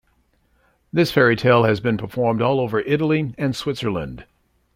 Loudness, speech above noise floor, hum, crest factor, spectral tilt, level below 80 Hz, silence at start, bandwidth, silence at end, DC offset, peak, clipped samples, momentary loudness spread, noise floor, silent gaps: -20 LUFS; 44 dB; none; 18 dB; -7 dB/octave; -50 dBFS; 0.95 s; 16.5 kHz; 0.55 s; under 0.1%; -2 dBFS; under 0.1%; 10 LU; -63 dBFS; none